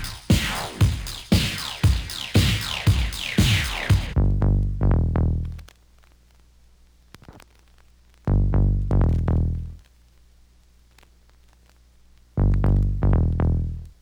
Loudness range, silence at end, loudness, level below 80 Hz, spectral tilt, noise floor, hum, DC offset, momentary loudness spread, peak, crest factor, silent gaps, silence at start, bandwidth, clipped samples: 9 LU; 0.1 s; -23 LUFS; -28 dBFS; -5.5 dB/octave; -55 dBFS; 60 Hz at -45 dBFS; under 0.1%; 7 LU; -6 dBFS; 18 dB; none; 0 s; over 20 kHz; under 0.1%